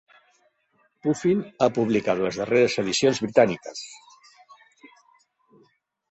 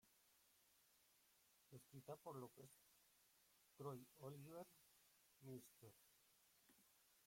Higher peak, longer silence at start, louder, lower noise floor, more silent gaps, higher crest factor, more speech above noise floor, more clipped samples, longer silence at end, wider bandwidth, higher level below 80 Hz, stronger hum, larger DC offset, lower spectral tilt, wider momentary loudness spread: first, -4 dBFS vs -44 dBFS; first, 1.05 s vs 0.05 s; first, -23 LUFS vs -61 LUFS; second, -67 dBFS vs -79 dBFS; neither; about the same, 22 dB vs 20 dB; first, 45 dB vs 19 dB; neither; first, 2.15 s vs 0 s; second, 8.4 kHz vs 16.5 kHz; first, -64 dBFS vs under -90 dBFS; neither; neither; about the same, -5 dB/octave vs -6 dB/octave; about the same, 12 LU vs 11 LU